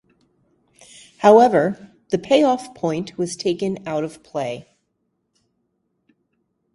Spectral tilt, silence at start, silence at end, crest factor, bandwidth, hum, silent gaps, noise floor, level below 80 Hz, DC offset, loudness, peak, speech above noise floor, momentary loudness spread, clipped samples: -5.5 dB/octave; 1.2 s; 2.15 s; 22 dB; 11.5 kHz; none; none; -72 dBFS; -62 dBFS; under 0.1%; -19 LUFS; 0 dBFS; 54 dB; 15 LU; under 0.1%